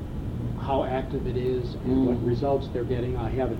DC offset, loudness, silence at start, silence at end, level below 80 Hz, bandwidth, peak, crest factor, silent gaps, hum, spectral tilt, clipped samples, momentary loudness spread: under 0.1%; -27 LUFS; 0 s; 0 s; -38 dBFS; 9.2 kHz; -12 dBFS; 14 dB; none; none; -9 dB/octave; under 0.1%; 7 LU